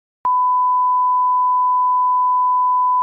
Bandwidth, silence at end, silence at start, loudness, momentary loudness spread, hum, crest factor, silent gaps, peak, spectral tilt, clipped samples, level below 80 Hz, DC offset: 1.6 kHz; 0 s; 0.25 s; -16 LUFS; 0 LU; none; 4 dB; none; -12 dBFS; 3 dB/octave; under 0.1%; -74 dBFS; under 0.1%